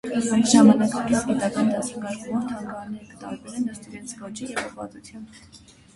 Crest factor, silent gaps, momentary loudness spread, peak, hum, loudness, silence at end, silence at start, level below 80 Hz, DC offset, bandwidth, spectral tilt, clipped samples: 20 dB; none; 22 LU; -4 dBFS; none; -22 LUFS; 0.4 s; 0.05 s; -58 dBFS; under 0.1%; 11.5 kHz; -4.5 dB/octave; under 0.1%